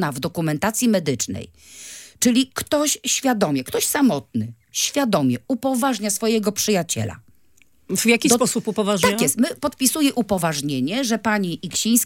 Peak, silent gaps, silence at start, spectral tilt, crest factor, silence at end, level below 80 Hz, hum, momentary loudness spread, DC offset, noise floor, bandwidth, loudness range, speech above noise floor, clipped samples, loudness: -2 dBFS; none; 0 s; -3.5 dB/octave; 20 dB; 0 s; -58 dBFS; none; 8 LU; under 0.1%; -60 dBFS; 17 kHz; 2 LU; 39 dB; under 0.1%; -20 LUFS